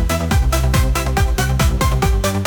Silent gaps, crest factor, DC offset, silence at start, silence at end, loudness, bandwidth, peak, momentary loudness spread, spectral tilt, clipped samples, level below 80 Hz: none; 10 dB; under 0.1%; 0 s; 0 s; -17 LUFS; 19.5 kHz; -6 dBFS; 1 LU; -5 dB/octave; under 0.1%; -18 dBFS